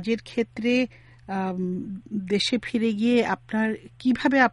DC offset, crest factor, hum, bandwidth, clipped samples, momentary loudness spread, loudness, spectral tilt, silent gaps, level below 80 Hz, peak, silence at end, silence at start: under 0.1%; 18 dB; none; 11 kHz; under 0.1%; 10 LU; -25 LUFS; -5.5 dB/octave; none; -58 dBFS; -8 dBFS; 0 s; 0 s